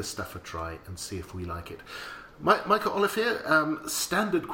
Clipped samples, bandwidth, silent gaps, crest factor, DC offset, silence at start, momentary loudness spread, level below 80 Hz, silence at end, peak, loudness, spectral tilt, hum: under 0.1%; 17 kHz; none; 22 dB; under 0.1%; 0 s; 15 LU; -54 dBFS; 0 s; -8 dBFS; -28 LUFS; -3.5 dB/octave; none